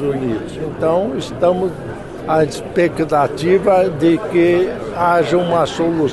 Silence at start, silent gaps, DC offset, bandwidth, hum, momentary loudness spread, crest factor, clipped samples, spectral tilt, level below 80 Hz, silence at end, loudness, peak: 0 s; none; under 0.1%; 12 kHz; none; 9 LU; 12 dB; under 0.1%; -6.5 dB/octave; -42 dBFS; 0 s; -16 LUFS; -4 dBFS